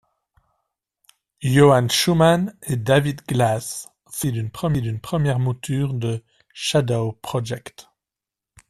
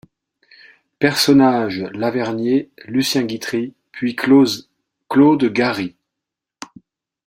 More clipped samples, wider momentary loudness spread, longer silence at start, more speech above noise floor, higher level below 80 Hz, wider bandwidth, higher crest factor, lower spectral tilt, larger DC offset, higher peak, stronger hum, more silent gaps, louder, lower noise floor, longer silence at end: neither; about the same, 14 LU vs 16 LU; first, 1.4 s vs 1 s; about the same, 68 dB vs 67 dB; first, -50 dBFS vs -60 dBFS; second, 14 kHz vs 16 kHz; about the same, 18 dB vs 18 dB; about the same, -5.5 dB/octave vs -5 dB/octave; neither; about the same, -4 dBFS vs -2 dBFS; neither; neither; second, -21 LUFS vs -17 LUFS; first, -88 dBFS vs -83 dBFS; second, 0.9 s vs 1.35 s